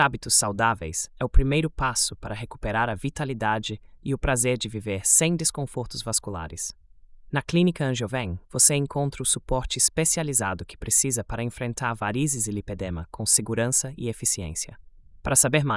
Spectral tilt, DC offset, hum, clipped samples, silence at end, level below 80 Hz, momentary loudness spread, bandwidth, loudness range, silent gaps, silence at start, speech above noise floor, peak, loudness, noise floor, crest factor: -3.5 dB/octave; under 0.1%; none; under 0.1%; 0 s; -36 dBFS; 14 LU; 12 kHz; 4 LU; none; 0 s; 23 dB; -4 dBFS; -24 LUFS; -48 dBFS; 20 dB